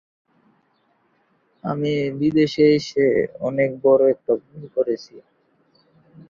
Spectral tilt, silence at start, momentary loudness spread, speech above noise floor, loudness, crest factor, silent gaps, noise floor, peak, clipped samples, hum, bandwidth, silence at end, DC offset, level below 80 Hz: -7 dB/octave; 1.65 s; 10 LU; 45 dB; -20 LUFS; 18 dB; none; -64 dBFS; -4 dBFS; under 0.1%; none; 7.4 kHz; 1.1 s; under 0.1%; -60 dBFS